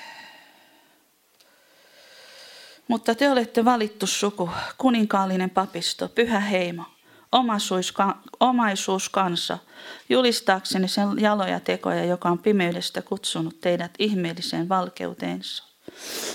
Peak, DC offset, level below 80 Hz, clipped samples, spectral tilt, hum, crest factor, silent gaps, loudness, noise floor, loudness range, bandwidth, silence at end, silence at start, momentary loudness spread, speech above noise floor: -2 dBFS; under 0.1%; -68 dBFS; under 0.1%; -4 dB/octave; none; 22 dB; none; -24 LUFS; -62 dBFS; 4 LU; 17 kHz; 0 s; 0 s; 13 LU; 38 dB